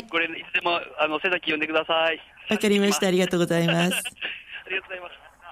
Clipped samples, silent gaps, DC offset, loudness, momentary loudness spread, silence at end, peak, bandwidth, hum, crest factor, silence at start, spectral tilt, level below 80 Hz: under 0.1%; none; under 0.1%; -24 LUFS; 11 LU; 0 s; -10 dBFS; 16 kHz; none; 16 dB; 0 s; -4 dB/octave; -64 dBFS